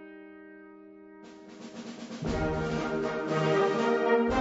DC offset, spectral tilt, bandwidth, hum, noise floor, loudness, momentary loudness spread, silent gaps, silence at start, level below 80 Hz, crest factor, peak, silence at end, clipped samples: under 0.1%; -6.5 dB/octave; 8 kHz; none; -50 dBFS; -28 LUFS; 25 LU; none; 0 s; -48 dBFS; 18 dB; -12 dBFS; 0 s; under 0.1%